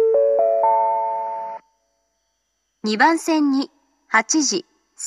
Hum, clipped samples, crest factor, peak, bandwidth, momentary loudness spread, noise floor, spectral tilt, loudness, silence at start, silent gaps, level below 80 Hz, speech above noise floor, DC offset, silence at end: none; under 0.1%; 18 dB; -2 dBFS; 13 kHz; 13 LU; -72 dBFS; -2.5 dB/octave; -19 LUFS; 0 s; none; -82 dBFS; 54 dB; under 0.1%; 0 s